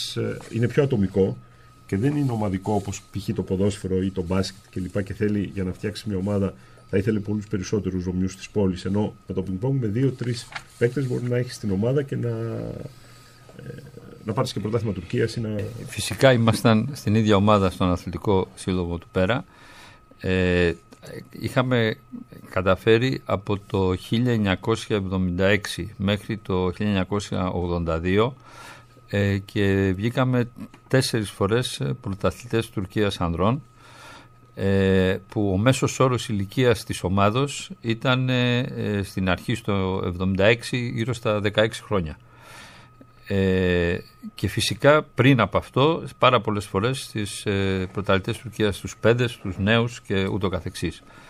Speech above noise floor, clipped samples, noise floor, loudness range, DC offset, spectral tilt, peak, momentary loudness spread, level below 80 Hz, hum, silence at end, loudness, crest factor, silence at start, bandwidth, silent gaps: 26 dB; under 0.1%; -49 dBFS; 6 LU; under 0.1%; -6 dB/octave; -2 dBFS; 11 LU; -48 dBFS; none; 0.1 s; -24 LUFS; 22 dB; 0 s; 15 kHz; none